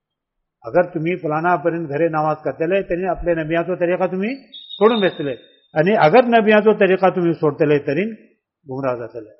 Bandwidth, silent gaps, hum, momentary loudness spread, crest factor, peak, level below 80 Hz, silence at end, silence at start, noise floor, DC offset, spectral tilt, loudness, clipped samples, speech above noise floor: 5.8 kHz; none; none; 14 LU; 16 dB; -2 dBFS; -48 dBFS; 0.1 s; 0.65 s; -77 dBFS; under 0.1%; -5 dB/octave; -18 LUFS; under 0.1%; 60 dB